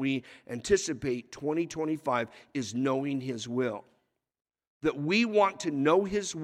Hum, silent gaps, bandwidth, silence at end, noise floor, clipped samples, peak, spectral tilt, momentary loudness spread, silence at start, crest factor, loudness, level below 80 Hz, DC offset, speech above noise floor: none; 4.67-4.81 s; 13 kHz; 0 s; -75 dBFS; under 0.1%; -12 dBFS; -5 dB/octave; 10 LU; 0 s; 18 dB; -30 LUFS; -62 dBFS; under 0.1%; 45 dB